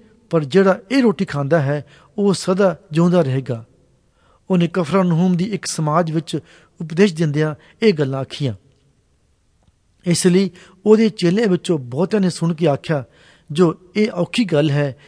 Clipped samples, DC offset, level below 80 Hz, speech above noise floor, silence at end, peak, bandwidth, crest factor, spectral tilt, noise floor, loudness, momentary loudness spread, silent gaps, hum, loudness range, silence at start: under 0.1%; under 0.1%; -60 dBFS; 43 dB; 0.15 s; 0 dBFS; 11 kHz; 18 dB; -6.5 dB/octave; -60 dBFS; -18 LUFS; 9 LU; none; none; 4 LU; 0.3 s